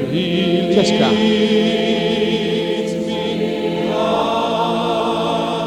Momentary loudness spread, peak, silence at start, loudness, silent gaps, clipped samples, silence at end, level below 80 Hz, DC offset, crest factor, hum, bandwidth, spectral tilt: 6 LU; -2 dBFS; 0 s; -17 LUFS; none; under 0.1%; 0 s; -50 dBFS; under 0.1%; 16 dB; none; 13 kHz; -5.5 dB/octave